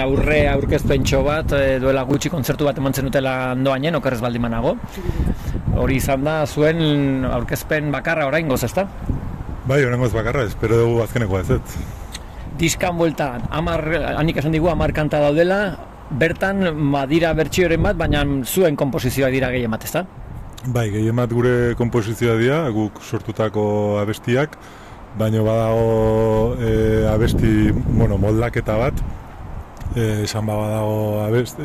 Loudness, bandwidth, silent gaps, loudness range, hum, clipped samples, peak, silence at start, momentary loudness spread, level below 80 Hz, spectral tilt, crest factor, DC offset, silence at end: -19 LUFS; 15 kHz; none; 3 LU; none; under 0.1%; -4 dBFS; 0 s; 10 LU; -30 dBFS; -6.5 dB/octave; 14 dB; under 0.1%; 0 s